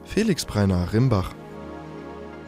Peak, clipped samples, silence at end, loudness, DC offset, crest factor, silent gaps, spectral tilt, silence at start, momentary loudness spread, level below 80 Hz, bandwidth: -8 dBFS; under 0.1%; 0 s; -23 LUFS; under 0.1%; 16 dB; none; -6.5 dB/octave; 0 s; 17 LU; -42 dBFS; 15.5 kHz